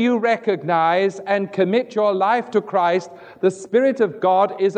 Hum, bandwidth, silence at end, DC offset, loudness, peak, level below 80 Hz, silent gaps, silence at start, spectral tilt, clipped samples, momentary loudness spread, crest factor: none; 9.4 kHz; 0 s; under 0.1%; -19 LUFS; -4 dBFS; -76 dBFS; none; 0 s; -6 dB/octave; under 0.1%; 5 LU; 14 dB